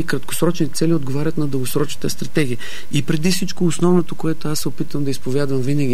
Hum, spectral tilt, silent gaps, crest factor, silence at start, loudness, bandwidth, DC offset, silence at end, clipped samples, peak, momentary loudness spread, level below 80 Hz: none; -5.5 dB/octave; none; 16 dB; 0 s; -21 LUFS; 16 kHz; 10%; 0 s; under 0.1%; -2 dBFS; 6 LU; -48 dBFS